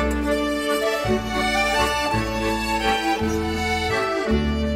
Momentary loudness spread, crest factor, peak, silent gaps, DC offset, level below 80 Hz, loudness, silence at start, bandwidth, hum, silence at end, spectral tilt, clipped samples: 3 LU; 14 dB; -8 dBFS; none; under 0.1%; -32 dBFS; -22 LUFS; 0 s; 16 kHz; none; 0 s; -4.5 dB/octave; under 0.1%